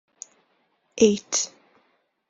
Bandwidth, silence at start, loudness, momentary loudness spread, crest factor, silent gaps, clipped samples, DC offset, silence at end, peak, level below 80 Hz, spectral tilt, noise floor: 7.8 kHz; 0.95 s; -22 LUFS; 24 LU; 24 dB; none; under 0.1%; under 0.1%; 0.8 s; -2 dBFS; -66 dBFS; -3.5 dB/octave; -69 dBFS